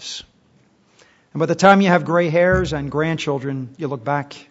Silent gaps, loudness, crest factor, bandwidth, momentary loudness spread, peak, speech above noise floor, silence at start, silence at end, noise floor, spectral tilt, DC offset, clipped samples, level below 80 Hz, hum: none; -18 LUFS; 20 dB; 8 kHz; 15 LU; 0 dBFS; 39 dB; 0 s; 0.1 s; -57 dBFS; -6 dB/octave; under 0.1%; under 0.1%; -42 dBFS; none